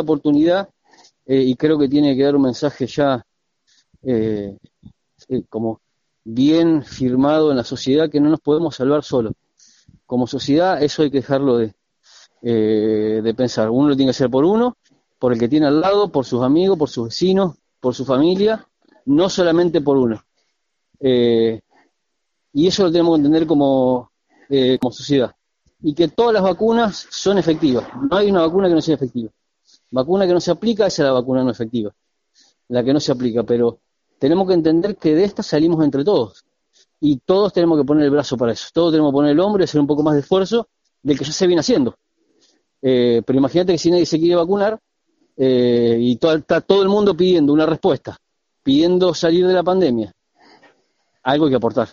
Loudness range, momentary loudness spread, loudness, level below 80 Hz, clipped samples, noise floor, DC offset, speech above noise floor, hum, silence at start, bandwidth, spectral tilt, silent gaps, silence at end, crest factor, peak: 3 LU; 9 LU; -17 LUFS; -52 dBFS; under 0.1%; -75 dBFS; under 0.1%; 59 dB; none; 0 s; 7.4 kHz; -5.5 dB/octave; none; 0.05 s; 18 dB; 0 dBFS